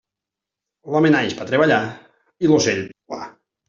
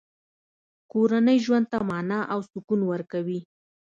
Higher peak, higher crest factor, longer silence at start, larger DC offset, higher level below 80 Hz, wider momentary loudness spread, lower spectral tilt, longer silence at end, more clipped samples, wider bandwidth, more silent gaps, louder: first, -2 dBFS vs -10 dBFS; about the same, 18 dB vs 16 dB; about the same, 0.85 s vs 0.95 s; neither; first, -60 dBFS vs -68 dBFS; first, 17 LU vs 11 LU; second, -5 dB/octave vs -7 dB/octave; about the same, 0.4 s vs 0.45 s; neither; about the same, 7.6 kHz vs 7.6 kHz; second, none vs 2.64-2.68 s; first, -18 LUFS vs -25 LUFS